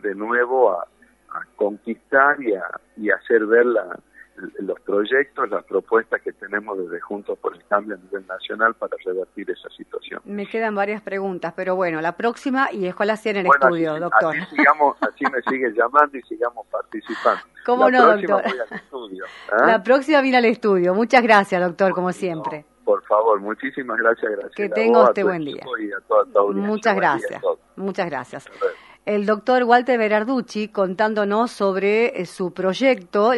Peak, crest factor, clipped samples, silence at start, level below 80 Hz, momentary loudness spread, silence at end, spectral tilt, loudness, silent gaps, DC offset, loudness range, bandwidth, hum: 0 dBFS; 20 dB; under 0.1%; 0.05 s; -68 dBFS; 15 LU; 0 s; -6 dB/octave; -20 LUFS; none; under 0.1%; 8 LU; 11.5 kHz; none